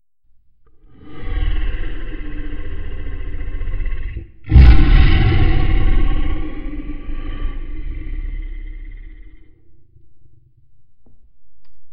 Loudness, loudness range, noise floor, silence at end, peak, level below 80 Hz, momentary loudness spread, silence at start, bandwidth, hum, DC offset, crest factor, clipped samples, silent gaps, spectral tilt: -20 LUFS; 19 LU; -50 dBFS; 0 s; 0 dBFS; -18 dBFS; 21 LU; 1.05 s; 5.4 kHz; none; under 0.1%; 16 dB; 0.3%; none; -9 dB/octave